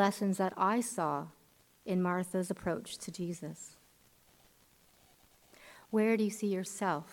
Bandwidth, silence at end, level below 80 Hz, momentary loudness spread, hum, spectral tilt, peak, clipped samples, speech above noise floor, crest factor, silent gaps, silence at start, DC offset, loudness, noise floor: 18 kHz; 0 s; -72 dBFS; 19 LU; none; -5.5 dB/octave; -16 dBFS; under 0.1%; 33 dB; 20 dB; none; 0 s; under 0.1%; -34 LUFS; -66 dBFS